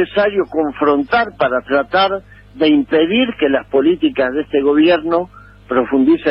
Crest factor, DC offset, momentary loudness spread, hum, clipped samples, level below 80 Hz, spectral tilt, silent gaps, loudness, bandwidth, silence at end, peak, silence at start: 12 dB; under 0.1%; 6 LU; 50 Hz at -45 dBFS; under 0.1%; -46 dBFS; -8 dB/octave; none; -15 LUFS; 5.6 kHz; 0 s; -4 dBFS; 0 s